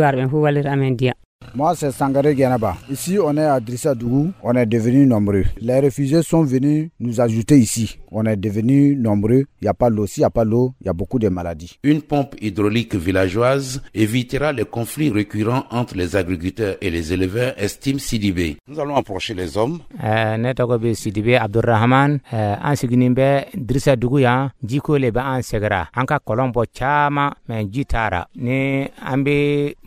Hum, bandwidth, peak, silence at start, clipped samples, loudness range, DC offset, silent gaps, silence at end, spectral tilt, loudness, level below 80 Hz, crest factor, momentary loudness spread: none; 16 kHz; -2 dBFS; 0 s; under 0.1%; 4 LU; under 0.1%; 1.25-1.39 s; 0.15 s; -6.5 dB/octave; -19 LUFS; -38 dBFS; 16 dB; 8 LU